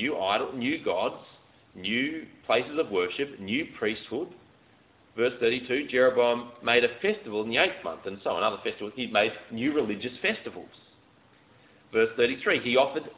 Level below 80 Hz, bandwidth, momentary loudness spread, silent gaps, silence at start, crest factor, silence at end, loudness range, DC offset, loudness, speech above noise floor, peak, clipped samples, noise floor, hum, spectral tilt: -66 dBFS; 4 kHz; 12 LU; none; 0 s; 22 dB; 0.05 s; 5 LU; under 0.1%; -27 LUFS; 32 dB; -6 dBFS; under 0.1%; -60 dBFS; none; -8 dB/octave